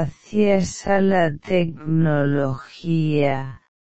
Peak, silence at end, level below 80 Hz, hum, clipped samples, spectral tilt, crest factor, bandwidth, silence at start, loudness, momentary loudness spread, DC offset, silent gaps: -6 dBFS; 0.15 s; -48 dBFS; none; under 0.1%; -7 dB/octave; 14 dB; 8.4 kHz; 0 s; -21 LUFS; 7 LU; 2%; none